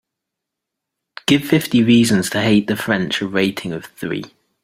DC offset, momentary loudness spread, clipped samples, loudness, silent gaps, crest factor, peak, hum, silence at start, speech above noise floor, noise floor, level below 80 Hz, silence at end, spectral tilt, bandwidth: under 0.1%; 13 LU; under 0.1%; -17 LUFS; none; 18 dB; 0 dBFS; none; 1.3 s; 65 dB; -81 dBFS; -54 dBFS; 0.35 s; -5 dB/octave; 16 kHz